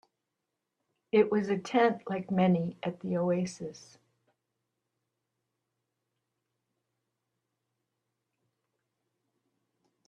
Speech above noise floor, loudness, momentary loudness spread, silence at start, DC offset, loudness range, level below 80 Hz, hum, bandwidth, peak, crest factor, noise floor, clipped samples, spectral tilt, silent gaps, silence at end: 57 dB; -29 LUFS; 11 LU; 1.15 s; under 0.1%; 11 LU; -76 dBFS; none; 9 kHz; -12 dBFS; 22 dB; -86 dBFS; under 0.1%; -7 dB/octave; none; 6.3 s